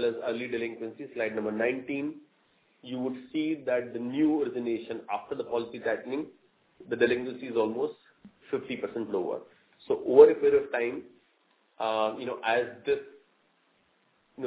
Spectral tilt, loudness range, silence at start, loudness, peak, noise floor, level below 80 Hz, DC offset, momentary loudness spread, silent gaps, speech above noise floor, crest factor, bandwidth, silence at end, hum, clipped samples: -4 dB/octave; 8 LU; 0 s; -29 LUFS; -4 dBFS; -69 dBFS; -70 dBFS; under 0.1%; 11 LU; none; 41 dB; 24 dB; 4 kHz; 0 s; none; under 0.1%